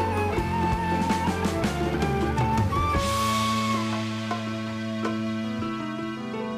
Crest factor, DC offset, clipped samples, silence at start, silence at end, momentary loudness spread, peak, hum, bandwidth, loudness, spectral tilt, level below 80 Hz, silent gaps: 14 dB; under 0.1%; under 0.1%; 0 s; 0 s; 7 LU; -12 dBFS; none; 15.5 kHz; -26 LUFS; -5.5 dB/octave; -40 dBFS; none